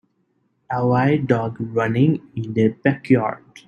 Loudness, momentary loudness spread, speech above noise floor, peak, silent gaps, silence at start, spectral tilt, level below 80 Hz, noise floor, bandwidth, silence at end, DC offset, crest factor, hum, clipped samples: -20 LUFS; 8 LU; 48 dB; -2 dBFS; none; 0.7 s; -9 dB/octave; -58 dBFS; -67 dBFS; 7.2 kHz; 0.1 s; under 0.1%; 18 dB; none; under 0.1%